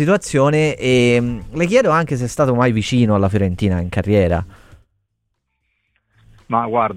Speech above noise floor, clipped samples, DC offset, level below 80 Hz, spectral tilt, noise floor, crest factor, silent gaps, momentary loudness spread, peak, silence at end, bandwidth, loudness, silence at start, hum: 56 dB; under 0.1%; under 0.1%; -40 dBFS; -6.5 dB/octave; -72 dBFS; 16 dB; none; 7 LU; -2 dBFS; 0 s; 15 kHz; -16 LUFS; 0 s; none